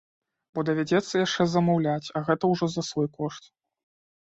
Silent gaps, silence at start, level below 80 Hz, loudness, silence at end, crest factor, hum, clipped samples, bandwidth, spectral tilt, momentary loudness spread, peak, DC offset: none; 0.55 s; -64 dBFS; -26 LUFS; 0.95 s; 18 dB; none; under 0.1%; 8 kHz; -6 dB/octave; 11 LU; -8 dBFS; under 0.1%